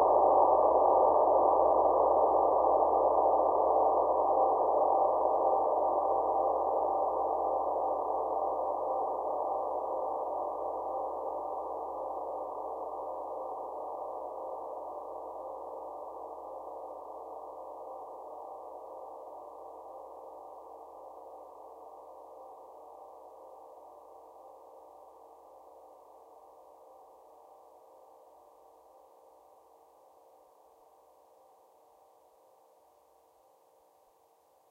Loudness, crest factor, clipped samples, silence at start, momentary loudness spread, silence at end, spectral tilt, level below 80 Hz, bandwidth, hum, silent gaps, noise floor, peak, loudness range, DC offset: -30 LUFS; 20 dB; under 0.1%; 0 s; 25 LU; 7.75 s; -8.5 dB/octave; -64 dBFS; 2.1 kHz; none; none; -66 dBFS; -12 dBFS; 24 LU; under 0.1%